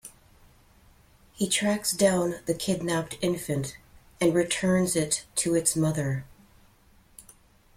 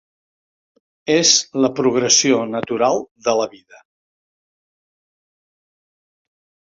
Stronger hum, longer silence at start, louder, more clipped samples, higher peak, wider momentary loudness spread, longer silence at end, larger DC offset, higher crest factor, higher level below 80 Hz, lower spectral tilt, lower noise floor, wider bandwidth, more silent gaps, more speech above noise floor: neither; second, 0.05 s vs 1.05 s; second, -26 LUFS vs -16 LUFS; neither; second, -8 dBFS vs -2 dBFS; about the same, 8 LU vs 9 LU; second, 0.55 s vs 3.25 s; neither; about the same, 20 dB vs 20 dB; first, -56 dBFS vs -64 dBFS; first, -4 dB/octave vs -2 dB/octave; second, -59 dBFS vs under -90 dBFS; first, 16.5 kHz vs 7.8 kHz; second, none vs 3.11-3.15 s; second, 33 dB vs over 73 dB